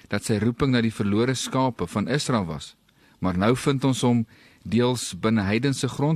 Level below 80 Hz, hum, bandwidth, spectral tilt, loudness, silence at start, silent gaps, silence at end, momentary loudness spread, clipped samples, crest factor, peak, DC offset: -52 dBFS; none; 13 kHz; -5.5 dB/octave; -24 LUFS; 0.1 s; none; 0 s; 7 LU; under 0.1%; 16 dB; -8 dBFS; under 0.1%